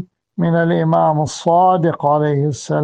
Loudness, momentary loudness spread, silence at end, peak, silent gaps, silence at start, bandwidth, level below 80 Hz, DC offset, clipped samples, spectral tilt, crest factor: -16 LUFS; 6 LU; 0 s; -2 dBFS; none; 0 s; 9.4 kHz; -56 dBFS; under 0.1%; under 0.1%; -7 dB/octave; 12 dB